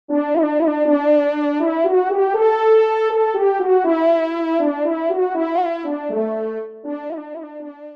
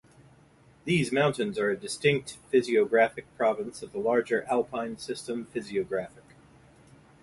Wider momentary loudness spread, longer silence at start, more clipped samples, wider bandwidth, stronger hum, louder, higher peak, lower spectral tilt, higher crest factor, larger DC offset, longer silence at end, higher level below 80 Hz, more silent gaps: first, 14 LU vs 10 LU; second, 0.1 s vs 0.85 s; neither; second, 6 kHz vs 11.5 kHz; neither; first, -18 LUFS vs -28 LUFS; first, -6 dBFS vs -10 dBFS; first, -6.5 dB/octave vs -5 dB/octave; second, 12 dB vs 20 dB; neither; second, 0 s vs 1.15 s; second, -74 dBFS vs -64 dBFS; neither